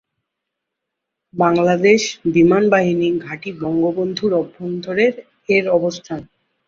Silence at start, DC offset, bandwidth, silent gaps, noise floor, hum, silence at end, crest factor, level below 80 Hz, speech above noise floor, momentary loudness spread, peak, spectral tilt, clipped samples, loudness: 1.35 s; under 0.1%; 7.6 kHz; none; -80 dBFS; none; 0.45 s; 16 dB; -56 dBFS; 63 dB; 15 LU; -2 dBFS; -5.5 dB/octave; under 0.1%; -17 LUFS